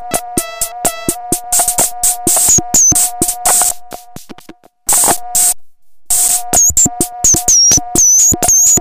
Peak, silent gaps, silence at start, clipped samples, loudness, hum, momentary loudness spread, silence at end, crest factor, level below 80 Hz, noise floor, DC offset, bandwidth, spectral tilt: 0 dBFS; none; 0 s; under 0.1%; -9 LUFS; none; 11 LU; 0 s; 12 dB; -34 dBFS; -39 dBFS; under 0.1%; 16 kHz; -1 dB/octave